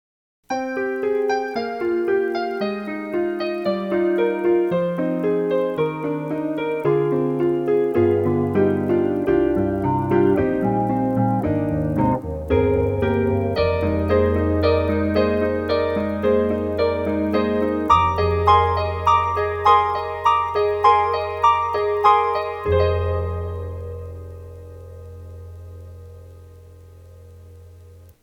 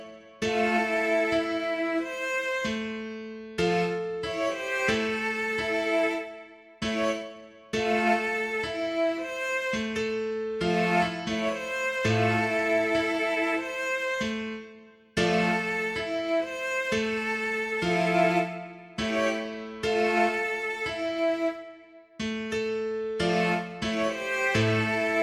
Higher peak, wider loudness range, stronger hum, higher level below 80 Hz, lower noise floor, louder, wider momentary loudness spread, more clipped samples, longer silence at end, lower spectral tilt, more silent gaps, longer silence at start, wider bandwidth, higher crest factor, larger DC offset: first, -2 dBFS vs -12 dBFS; first, 6 LU vs 2 LU; first, 60 Hz at -60 dBFS vs none; first, -40 dBFS vs -58 dBFS; second, -45 dBFS vs -51 dBFS; first, -20 LUFS vs -27 LUFS; first, 12 LU vs 9 LU; neither; first, 0.15 s vs 0 s; first, -8 dB/octave vs -5 dB/octave; neither; first, 0.5 s vs 0 s; about the same, 15.5 kHz vs 16 kHz; about the same, 18 dB vs 16 dB; neither